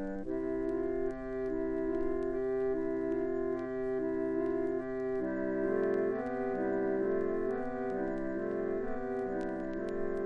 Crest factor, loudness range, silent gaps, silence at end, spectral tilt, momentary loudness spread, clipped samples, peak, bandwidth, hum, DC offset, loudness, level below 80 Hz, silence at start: 14 dB; 1 LU; none; 0 s; -9 dB/octave; 4 LU; under 0.1%; -20 dBFS; 4.9 kHz; none; under 0.1%; -34 LUFS; -52 dBFS; 0 s